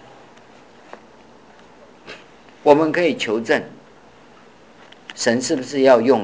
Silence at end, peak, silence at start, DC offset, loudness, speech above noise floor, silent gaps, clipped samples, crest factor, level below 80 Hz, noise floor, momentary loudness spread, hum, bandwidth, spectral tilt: 0 s; 0 dBFS; 2.05 s; 0.2%; -18 LUFS; 31 dB; none; under 0.1%; 20 dB; -64 dBFS; -47 dBFS; 25 LU; none; 8 kHz; -4 dB/octave